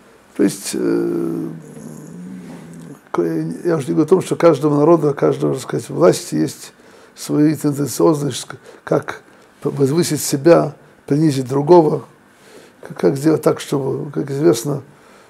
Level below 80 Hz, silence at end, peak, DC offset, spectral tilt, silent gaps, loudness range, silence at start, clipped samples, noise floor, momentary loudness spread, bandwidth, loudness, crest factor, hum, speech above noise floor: -62 dBFS; 0.45 s; 0 dBFS; under 0.1%; -6 dB/octave; none; 6 LU; 0.35 s; under 0.1%; -44 dBFS; 21 LU; 15.5 kHz; -17 LUFS; 18 dB; none; 28 dB